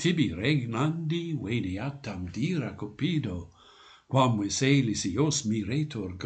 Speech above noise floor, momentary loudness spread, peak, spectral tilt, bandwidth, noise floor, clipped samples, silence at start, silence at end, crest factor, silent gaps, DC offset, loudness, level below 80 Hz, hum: 27 dB; 11 LU; -10 dBFS; -5 dB/octave; 9.2 kHz; -55 dBFS; under 0.1%; 0 s; 0 s; 20 dB; none; under 0.1%; -29 LUFS; -56 dBFS; none